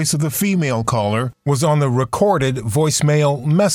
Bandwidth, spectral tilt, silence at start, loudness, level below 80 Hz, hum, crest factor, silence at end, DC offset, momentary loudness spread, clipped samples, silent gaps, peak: 16.5 kHz; -5.5 dB/octave; 0 s; -17 LUFS; -48 dBFS; none; 12 dB; 0 s; under 0.1%; 3 LU; under 0.1%; none; -4 dBFS